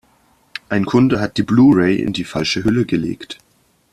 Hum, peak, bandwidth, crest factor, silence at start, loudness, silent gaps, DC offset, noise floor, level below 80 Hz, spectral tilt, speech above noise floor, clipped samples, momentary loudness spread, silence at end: none; -2 dBFS; 12 kHz; 14 dB; 0.7 s; -16 LUFS; none; under 0.1%; -56 dBFS; -46 dBFS; -6.5 dB/octave; 41 dB; under 0.1%; 21 LU; 0.6 s